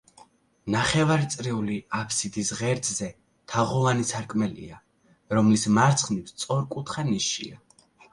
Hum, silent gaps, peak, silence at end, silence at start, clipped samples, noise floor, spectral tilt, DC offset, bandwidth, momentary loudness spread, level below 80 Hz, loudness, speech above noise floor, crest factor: none; none; -6 dBFS; 0.55 s; 0.65 s; under 0.1%; -56 dBFS; -4.5 dB/octave; under 0.1%; 11.5 kHz; 11 LU; -56 dBFS; -25 LUFS; 31 dB; 20 dB